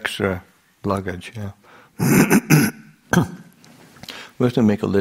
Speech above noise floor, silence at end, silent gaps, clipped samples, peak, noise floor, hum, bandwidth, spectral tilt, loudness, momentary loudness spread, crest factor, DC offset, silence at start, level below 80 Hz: 30 dB; 0 s; none; under 0.1%; 0 dBFS; -48 dBFS; none; 16 kHz; -5.5 dB/octave; -19 LUFS; 20 LU; 20 dB; under 0.1%; 0 s; -50 dBFS